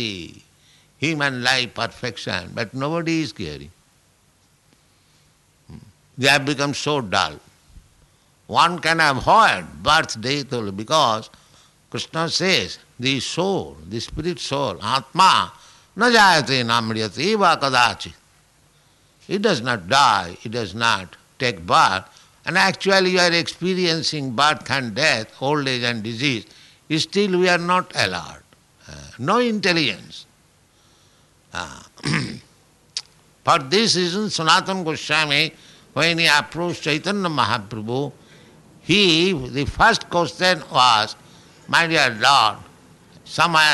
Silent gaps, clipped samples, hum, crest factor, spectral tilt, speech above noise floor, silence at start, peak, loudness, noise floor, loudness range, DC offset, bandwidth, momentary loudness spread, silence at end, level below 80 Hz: none; under 0.1%; none; 18 dB; -3.5 dB/octave; 39 dB; 0 s; -2 dBFS; -19 LUFS; -59 dBFS; 6 LU; under 0.1%; 12 kHz; 15 LU; 0 s; -50 dBFS